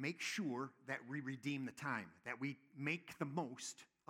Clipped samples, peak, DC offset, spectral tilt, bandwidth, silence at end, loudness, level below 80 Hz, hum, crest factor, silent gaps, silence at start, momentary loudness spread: under 0.1%; -24 dBFS; under 0.1%; -4.5 dB/octave; 17 kHz; 0.25 s; -45 LUFS; -90 dBFS; none; 20 dB; none; 0 s; 6 LU